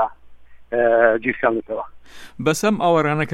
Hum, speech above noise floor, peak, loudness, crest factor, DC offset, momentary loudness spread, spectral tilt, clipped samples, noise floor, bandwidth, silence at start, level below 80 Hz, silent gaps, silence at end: none; 21 dB; -2 dBFS; -19 LUFS; 18 dB; under 0.1%; 13 LU; -5.5 dB/octave; under 0.1%; -40 dBFS; 16 kHz; 0 s; -52 dBFS; none; 0 s